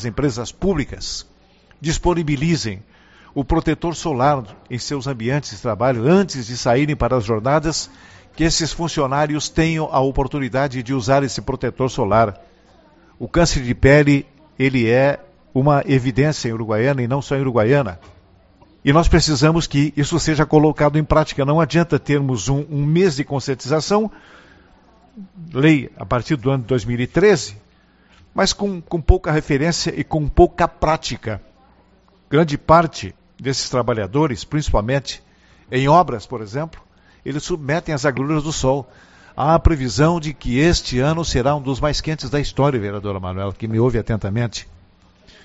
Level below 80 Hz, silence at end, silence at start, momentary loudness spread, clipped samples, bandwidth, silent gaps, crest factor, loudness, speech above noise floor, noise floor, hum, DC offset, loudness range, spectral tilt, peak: -32 dBFS; 0.75 s; 0 s; 11 LU; under 0.1%; 8 kHz; none; 18 dB; -19 LUFS; 36 dB; -54 dBFS; none; under 0.1%; 5 LU; -5.5 dB/octave; 0 dBFS